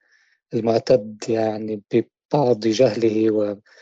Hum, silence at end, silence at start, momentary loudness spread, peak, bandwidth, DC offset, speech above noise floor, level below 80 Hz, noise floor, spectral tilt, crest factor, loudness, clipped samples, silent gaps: none; 0.25 s; 0.5 s; 7 LU; -6 dBFS; 8 kHz; under 0.1%; 42 dB; -64 dBFS; -62 dBFS; -6.5 dB/octave; 16 dB; -21 LUFS; under 0.1%; 2.25-2.29 s